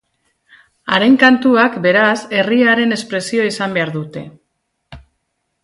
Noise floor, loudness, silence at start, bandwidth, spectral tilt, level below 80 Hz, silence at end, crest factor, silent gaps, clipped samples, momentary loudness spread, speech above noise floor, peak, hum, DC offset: -70 dBFS; -13 LUFS; 0.85 s; 11.5 kHz; -5 dB/octave; -54 dBFS; 0.65 s; 16 dB; none; under 0.1%; 14 LU; 56 dB; 0 dBFS; none; under 0.1%